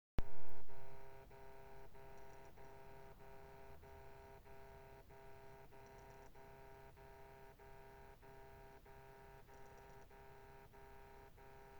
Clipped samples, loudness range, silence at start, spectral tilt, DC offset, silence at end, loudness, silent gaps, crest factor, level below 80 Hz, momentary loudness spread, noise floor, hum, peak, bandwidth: under 0.1%; 1 LU; 0.2 s; -6 dB/octave; under 0.1%; 0 s; -61 LUFS; none; 18 dB; -58 dBFS; 2 LU; -60 dBFS; none; -24 dBFS; over 20 kHz